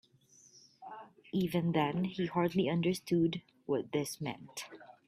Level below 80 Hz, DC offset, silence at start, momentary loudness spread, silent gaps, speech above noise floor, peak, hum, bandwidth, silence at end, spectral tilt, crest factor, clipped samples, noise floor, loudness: -70 dBFS; under 0.1%; 0.8 s; 19 LU; none; 31 dB; -18 dBFS; none; 15 kHz; 0.15 s; -6 dB/octave; 16 dB; under 0.1%; -64 dBFS; -34 LUFS